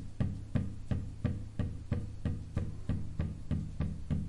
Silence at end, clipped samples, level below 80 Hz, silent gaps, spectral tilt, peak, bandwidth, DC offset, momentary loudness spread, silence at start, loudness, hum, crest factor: 0 s; under 0.1%; -44 dBFS; none; -8.5 dB/octave; -18 dBFS; 11 kHz; under 0.1%; 3 LU; 0 s; -38 LUFS; none; 18 dB